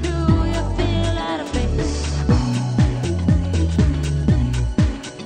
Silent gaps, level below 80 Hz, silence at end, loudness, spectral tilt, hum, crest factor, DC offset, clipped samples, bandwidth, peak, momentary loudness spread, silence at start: none; -24 dBFS; 0 s; -20 LUFS; -6.5 dB/octave; none; 14 dB; under 0.1%; under 0.1%; 9.6 kHz; -4 dBFS; 4 LU; 0 s